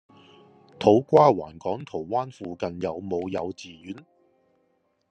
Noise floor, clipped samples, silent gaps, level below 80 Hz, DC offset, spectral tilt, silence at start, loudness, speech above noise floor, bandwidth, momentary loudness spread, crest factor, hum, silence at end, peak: -70 dBFS; under 0.1%; none; -66 dBFS; under 0.1%; -7.5 dB/octave; 0.8 s; -24 LUFS; 46 dB; 8.6 kHz; 22 LU; 22 dB; none; 1.1 s; -4 dBFS